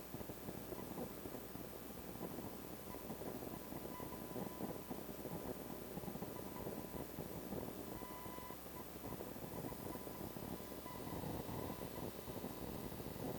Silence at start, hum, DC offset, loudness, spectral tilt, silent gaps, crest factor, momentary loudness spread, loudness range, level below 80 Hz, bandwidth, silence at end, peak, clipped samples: 0 s; none; under 0.1%; -48 LUFS; -5.5 dB/octave; none; 18 dB; 3 LU; 1 LU; -62 dBFS; over 20 kHz; 0 s; -30 dBFS; under 0.1%